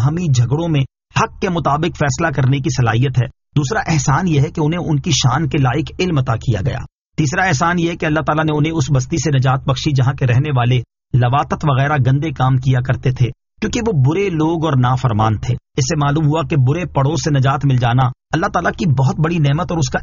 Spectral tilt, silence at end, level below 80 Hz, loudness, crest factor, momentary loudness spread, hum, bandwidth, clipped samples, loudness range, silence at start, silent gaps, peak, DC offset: -6 dB/octave; 0 s; -36 dBFS; -16 LUFS; 14 dB; 5 LU; none; 7.4 kHz; under 0.1%; 1 LU; 0 s; 7.01-7.05 s; -2 dBFS; under 0.1%